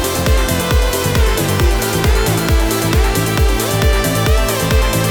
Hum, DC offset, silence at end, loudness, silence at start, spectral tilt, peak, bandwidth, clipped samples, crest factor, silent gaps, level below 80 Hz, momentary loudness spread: none; under 0.1%; 0 s; -15 LUFS; 0 s; -4.5 dB/octave; -2 dBFS; over 20 kHz; under 0.1%; 12 dB; none; -18 dBFS; 1 LU